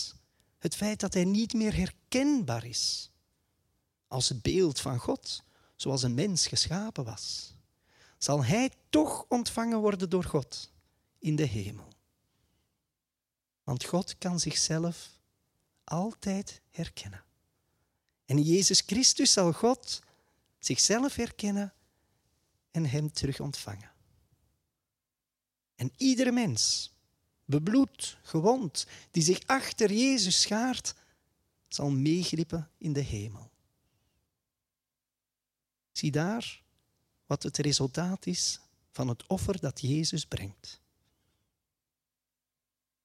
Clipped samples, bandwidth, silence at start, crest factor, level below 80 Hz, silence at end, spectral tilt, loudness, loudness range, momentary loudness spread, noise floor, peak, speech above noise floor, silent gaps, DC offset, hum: under 0.1%; 15.5 kHz; 0 s; 22 dB; -56 dBFS; 2.3 s; -4 dB/octave; -29 LUFS; 11 LU; 15 LU; under -90 dBFS; -10 dBFS; over 61 dB; none; under 0.1%; none